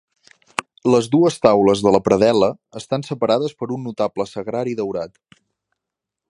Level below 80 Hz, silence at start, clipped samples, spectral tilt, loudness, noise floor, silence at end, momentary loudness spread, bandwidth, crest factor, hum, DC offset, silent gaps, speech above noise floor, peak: -54 dBFS; 0.6 s; under 0.1%; -6 dB/octave; -19 LUFS; -84 dBFS; 1.25 s; 14 LU; 11.5 kHz; 18 dB; none; under 0.1%; none; 66 dB; 0 dBFS